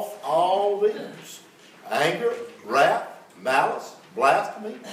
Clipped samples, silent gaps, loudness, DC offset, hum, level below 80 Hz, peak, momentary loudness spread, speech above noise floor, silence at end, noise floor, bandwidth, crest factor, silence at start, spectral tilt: under 0.1%; none; -23 LUFS; under 0.1%; none; -84 dBFS; -6 dBFS; 17 LU; 26 dB; 0 s; -49 dBFS; 16 kHz; 18 dB; 0 s; -3.5 dB/octave